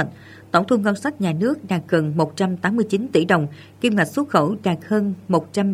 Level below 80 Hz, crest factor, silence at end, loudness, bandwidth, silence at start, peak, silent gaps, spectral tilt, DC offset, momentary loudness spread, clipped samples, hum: -62 dBFS; 20 dB; 0 s; -21 LUFS; 15 kHz; 0 s; 0 dBFS; none; -6.5 dB/octave; under 0.1%; 5 LU; under 0.1%; none